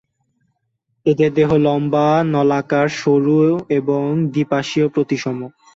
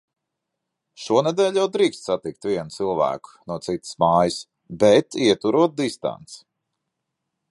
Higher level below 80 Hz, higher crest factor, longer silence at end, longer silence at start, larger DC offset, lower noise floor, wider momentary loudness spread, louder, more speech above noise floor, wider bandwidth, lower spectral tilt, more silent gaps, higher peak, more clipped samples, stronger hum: about the same, -54 dBFS vs -58 dBFS; second, 14 dB vs 20 dB; second, 0.25 s vs 1.15 s; about the same, 1.05 s vs 1 s; neither; second, -70 dBFS vs -81 dBFS; second, 5 LU vs 15 LU; first, -17 LUFS vs -21 LUFS; second, 54 dB vs 60 dB; second, 7.8 kHz vs 11.5 kHz; first, -7 dB/octave vs -5 dB/octave; neither; about the same, -4 dBFS vs -4 dBFS; neither; neither